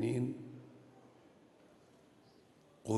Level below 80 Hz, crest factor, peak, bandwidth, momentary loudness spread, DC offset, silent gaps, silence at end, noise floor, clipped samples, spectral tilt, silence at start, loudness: -78 dBFS; 22 dB; -20 dBFS; 12 kHz; 26 LU; under 0.1%; none; 0 s; -65 dBFS; under 0.1%; -7.5 dB/octave; 0 s; -42 LUFS